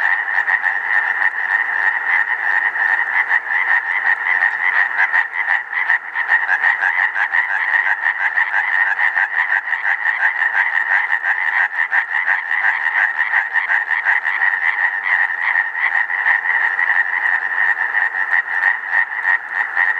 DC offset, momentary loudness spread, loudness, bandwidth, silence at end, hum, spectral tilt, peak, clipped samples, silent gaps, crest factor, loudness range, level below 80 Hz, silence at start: under 0.1%; 2 LU; -15 LUFS; 8.6 kHz; 0 s; none; 0 dB/octave; -2 dBFS; under 0.1%; none; 16 dB; 1 LU; -72 dBFS; 0 s